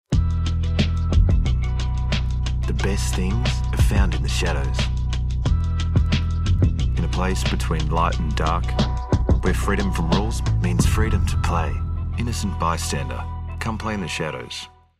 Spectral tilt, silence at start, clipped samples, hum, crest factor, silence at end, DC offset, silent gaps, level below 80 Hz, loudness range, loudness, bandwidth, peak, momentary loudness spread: -5.5 dB/octave; 0.1 s; under 0.1%; none; 14 dB; 0.3 s; under 0.1%; none; -24 dBFS; 2 LU; -22 LUFS; 14 kHz; -6 dBFS; 6 LU